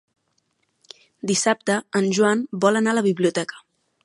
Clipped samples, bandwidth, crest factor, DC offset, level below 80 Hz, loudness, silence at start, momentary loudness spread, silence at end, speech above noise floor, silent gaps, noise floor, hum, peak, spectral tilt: under 0.1%; 11.5 kHz; 20 dB; under 0.1%; -72 dBFS; -21 LUFS; 1.25 s; 7 LU; 0.45 s; 50 dB; none; -70 dBFS; none; -2 dBFS; -4 dB/octave